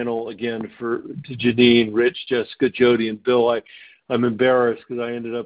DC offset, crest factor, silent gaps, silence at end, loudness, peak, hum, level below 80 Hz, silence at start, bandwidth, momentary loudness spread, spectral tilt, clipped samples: under 0.1%; 18 dB; none; 0 s; -20 LUFS; -2 dBFS; none; -58 dBFS; 0 s; 4 kHz; 12 LU; -10 dB/octave; under 0.1%